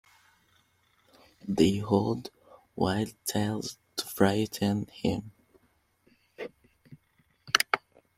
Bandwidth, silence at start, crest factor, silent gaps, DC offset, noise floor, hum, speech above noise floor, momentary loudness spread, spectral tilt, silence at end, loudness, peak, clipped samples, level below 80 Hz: 16.5 kHz; 1.45 s; 28 dB; none; under 0.1%; -70 dBFS; none; 42 dB; 18 LU; -4.5 dB/octave; 0.4 s; -29 LUFS; -4 dBFS; under 0.1%; -62 dBFS